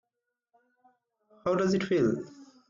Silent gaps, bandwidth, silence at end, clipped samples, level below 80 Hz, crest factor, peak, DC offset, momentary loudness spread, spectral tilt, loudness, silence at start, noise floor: none; 7.6 kHz; 0.25 s; under 0.1%; -66 dBFS; 16 dB; -16 dBFS; under 0.1%; 10 LU; -6.5 dB/octave; -28 LUFS; 1.45 s; -86 dBFS